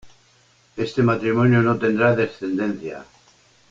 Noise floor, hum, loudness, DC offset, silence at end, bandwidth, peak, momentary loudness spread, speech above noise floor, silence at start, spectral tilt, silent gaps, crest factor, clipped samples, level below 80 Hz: -57 dBFS; none; -20 LUFS; under 0.1%; 0.65 s; 7.6 kHz; -4 dBFS; 16 LU; 38 dB; 0.05 s; -8 dB/octave; none; 16 dB; under 0.1%; -54 dBFS